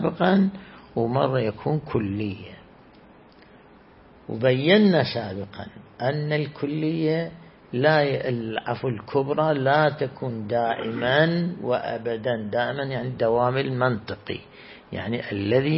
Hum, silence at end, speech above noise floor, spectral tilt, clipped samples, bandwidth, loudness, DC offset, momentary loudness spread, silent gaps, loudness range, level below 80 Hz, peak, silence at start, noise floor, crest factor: none; 0 s; 27 dB; -11 dB/octave; under 0.1%; 5.8 kHz; -24 LUFS; under 0.1%; 15 LU; none; 4 LU; -58 dBFS; -4 dBFS; 0 s; -51 dBFS; 20 dB